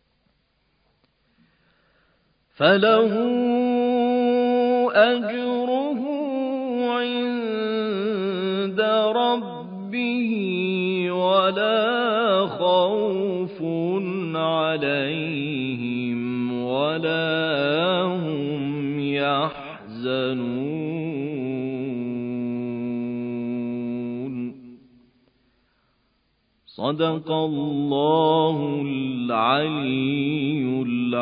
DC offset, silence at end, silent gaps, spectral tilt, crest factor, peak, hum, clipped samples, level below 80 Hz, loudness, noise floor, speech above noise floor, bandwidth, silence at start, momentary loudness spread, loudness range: under 0.1%; 0 s; none; -10.5 dB/octave; 20 dB; -2 dBFS; none; under 0.1%; -68 dBFS; -23 LUFS; -68 dBFS; 46 dB; 5.2 kHz; 2.6 s; 9 LU; 8 LU